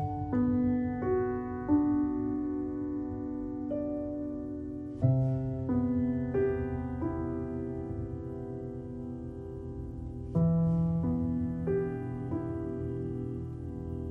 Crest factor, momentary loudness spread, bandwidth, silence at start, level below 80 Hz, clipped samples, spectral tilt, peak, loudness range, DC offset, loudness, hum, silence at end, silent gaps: 16 dB; 12 LU; 3.3 kHz; 0 s; -48 dBFS; under 0.1%; -12 dB/octave; -14 dBFS; 4 LU; under 0.1%; -33 LUFS; none; 0 s; none